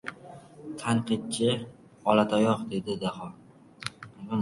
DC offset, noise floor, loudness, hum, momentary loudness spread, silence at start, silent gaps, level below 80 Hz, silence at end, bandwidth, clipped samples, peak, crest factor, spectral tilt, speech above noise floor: under 0.1%; -48 dBFS; -28 LUFS; none; 21 LU; 0.05 s; none; -64 dBFS; 0 s; 11.5 kHz; under 0.1%; -6 dBFS; 22 dB; -5.5 dB/octave; 21 dB